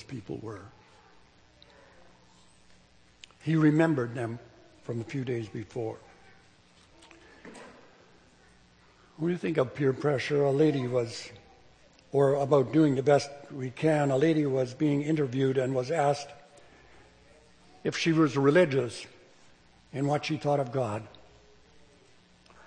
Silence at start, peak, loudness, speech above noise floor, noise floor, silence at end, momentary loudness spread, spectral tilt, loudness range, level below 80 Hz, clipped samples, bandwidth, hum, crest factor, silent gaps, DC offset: 0 s; -10 dBFS; -28 LUFS; 33 dB; -60 dBFS; 1.6 s; 18 LU; -7 dB/octave; 13 LU; -68 dBFS; under 0.1%; 9.8 kHz; none; 20 dB; none; under 0.1%